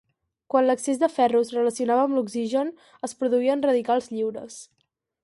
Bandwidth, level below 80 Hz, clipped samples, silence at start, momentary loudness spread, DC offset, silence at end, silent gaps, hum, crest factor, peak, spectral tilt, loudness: 11.5 kHz; -74 dBFS; under 0.1%; 0.55 s; 13 LU; under 0.1%; 0.6 s; none; none; 18 dB; -6 dBFS; -4.5 dB/octave; -24 LUFS